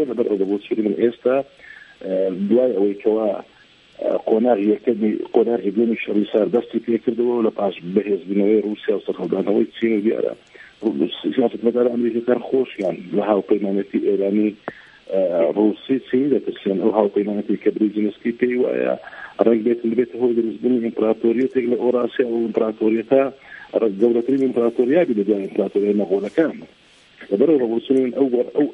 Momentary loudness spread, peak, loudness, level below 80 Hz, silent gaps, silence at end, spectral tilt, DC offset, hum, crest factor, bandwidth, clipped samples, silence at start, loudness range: 6 LU; 0 dBFS; -20 LUFS; -66 dBFS; none; 0 s; -8.5 dB/octave; under 0.1%; none; 18 dB; 5 kHz; under 0.1%; 0 s; 2 LU